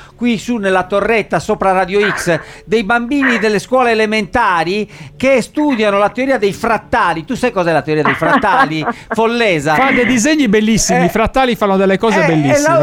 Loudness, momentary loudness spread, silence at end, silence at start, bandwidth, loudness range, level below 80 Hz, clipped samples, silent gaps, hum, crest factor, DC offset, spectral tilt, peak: -13 LUFS; 6 LU; 0 s; 0 s; 16.5 kHz; 2 LU; -38 dBFS; under 0.1%; none; none; 12 dB; under 0.1%; -4.5 dB/octave; 0 dBFS